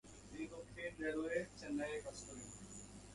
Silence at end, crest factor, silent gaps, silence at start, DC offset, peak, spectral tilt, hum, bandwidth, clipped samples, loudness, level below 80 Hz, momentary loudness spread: 0 s; 20 dB; none; 0.05 s; under 0.1%; -28 dBFS; -4.5 dB/octave; none; 11.5 kHz; under 0.1%; -46 LUFS; -66 dBFS; 12 LU